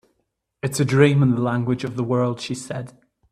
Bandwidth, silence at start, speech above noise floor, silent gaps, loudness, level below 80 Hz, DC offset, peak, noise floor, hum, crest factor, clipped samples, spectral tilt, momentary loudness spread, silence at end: 14 kHz; 0.65 s; 54 dB; none; -21 LUFS; -58 dBFS; under 0.1%; -2 dBFS; -74 dBFS; none; 20 dB; under 0.1%; -6.5 dB/octave; 15 LU; 0.4 s